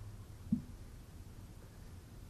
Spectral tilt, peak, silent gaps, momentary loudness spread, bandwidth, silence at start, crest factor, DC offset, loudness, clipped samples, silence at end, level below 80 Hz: -7 dB/octave; -22 dBFS; none; 14 LU; 14 kHz; 0 s; 24 dB; under 0.1%; -47 LUFS; under 0.1%; 0 s; -56 dBFS